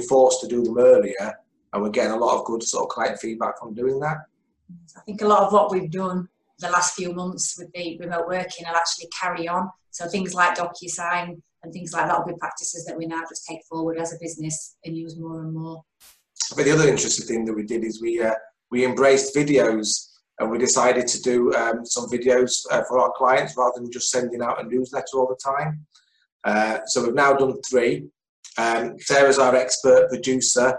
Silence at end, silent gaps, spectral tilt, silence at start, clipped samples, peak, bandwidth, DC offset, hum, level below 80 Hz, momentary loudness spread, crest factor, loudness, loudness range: 0 s; 26.32-26.40 s, 28.29-28.43 s; -3.5 dB/octave; 0 s; under 0.1%; -4 dBFS; 11.5 kHz; under 0.1%; none; -62 dBFS; 14 LU; 18 dB; -22 LUFS; 7 LU